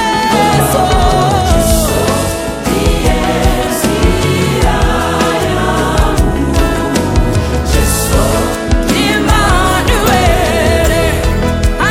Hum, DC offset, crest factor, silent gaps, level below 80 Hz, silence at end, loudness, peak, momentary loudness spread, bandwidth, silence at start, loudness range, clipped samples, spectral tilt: none; under 0.1%; 10 dB; none; -16 dBFS; 0 s; -12 LUFS; 0 dBFS; 4 LU; 17 kHz; 0 s; 2 LU; under 0.1%; -5 dB/octave